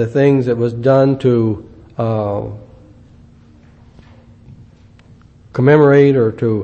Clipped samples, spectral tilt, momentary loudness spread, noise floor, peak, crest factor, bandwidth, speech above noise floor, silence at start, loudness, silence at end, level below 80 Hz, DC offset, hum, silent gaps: under 0.1%; -9.5 dB/octave; 17 LU; -44 dBFS; 0 dBFS; 16 dB; 7 kHz; 32 dB; 0 s; -13 LUFS; 0 s; -48 dBFS; under 0.1%; none; none